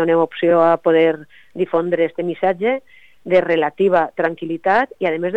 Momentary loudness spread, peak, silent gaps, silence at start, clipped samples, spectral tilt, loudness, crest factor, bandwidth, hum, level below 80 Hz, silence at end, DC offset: 9 LU; -2 dBFS; none; 0 s; under 0.1%; -8 dB/octave; -17 LUFS; 14 dB; 5.4 kHz; none; -60 dBFS; 0 s; 0.4%